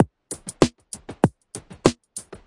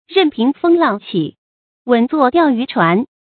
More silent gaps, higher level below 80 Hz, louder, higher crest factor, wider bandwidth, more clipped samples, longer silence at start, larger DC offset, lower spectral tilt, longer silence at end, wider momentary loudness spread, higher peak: second, none vs 1.38-1.85 s; first, -50 dBFS vs -60 dBFS; second, -24 LUFS vs -15 LUFS; first, 24 dB vs 16 dB; first, 11.5 kHz vs 4.6 kHz; neither; about the same, 0 s vs 0.1 s; neither; second, -5.5 dB/octave vs -9 dB/octave; second, 0.1 s vs 0.3 s; first, 16 LU vs 8 LU; about the same, -2 dBFS vs 0 dBFS